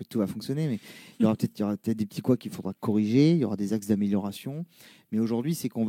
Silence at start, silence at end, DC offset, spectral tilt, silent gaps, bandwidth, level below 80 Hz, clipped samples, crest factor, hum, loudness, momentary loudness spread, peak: 0 s; 0 s; under 0.1%; -7.5 dB/octave; none; 16.5 kHz; -68 dBFS; under 0.1%; 18 dB; none; -28 LUFS; 14 LU; -10 dBFS